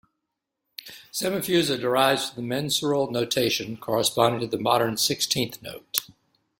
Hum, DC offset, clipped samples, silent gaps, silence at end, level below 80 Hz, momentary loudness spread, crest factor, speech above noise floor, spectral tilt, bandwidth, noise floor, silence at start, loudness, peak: none; under 0.1%; under 0.1%; none; 0.55 s; -62 dBFS; 11 LU; 26 dB; 58 dB; -3.5 dB/octave; 17 kHz; -82 dBFS; 0.85 s; -24 LUFS; 0 dBFS